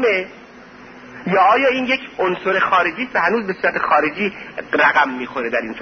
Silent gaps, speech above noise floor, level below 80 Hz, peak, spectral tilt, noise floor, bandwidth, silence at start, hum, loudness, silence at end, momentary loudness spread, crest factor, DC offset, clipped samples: none; 23 dB; -56 dBFS; -2 dBFS; -5.5 dB/octave; -41 dBFS; 6.6 kHz; 0 s; none; -17 LUFS; 0 s; 10 LU; 16 dB; under 0.1%; under 0.1%